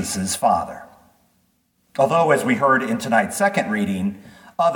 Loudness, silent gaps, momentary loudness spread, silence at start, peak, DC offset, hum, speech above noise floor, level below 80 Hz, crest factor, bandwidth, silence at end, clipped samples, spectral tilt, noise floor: -19 LUFS; none; 15 LU; 0 s; -4 dBFS; under 0.1%; none; 45 dB; -58 dBFS; 18 dB; 19 kHz; 0 s; under 0.1%; -4.5 dB/octave; -65 dBFS